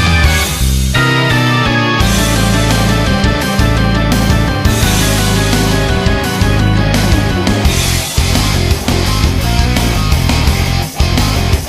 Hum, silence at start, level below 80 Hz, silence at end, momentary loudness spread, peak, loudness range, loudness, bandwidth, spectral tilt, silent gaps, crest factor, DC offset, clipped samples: none; 0 s; -16 dBFS; 0 s; 2 LU; 0 dBFS; 1 LU; -12 LUFS; 15.5 kHz; -4.5 dB/octave; none; 10 dB; under 0.1%; under 0.1%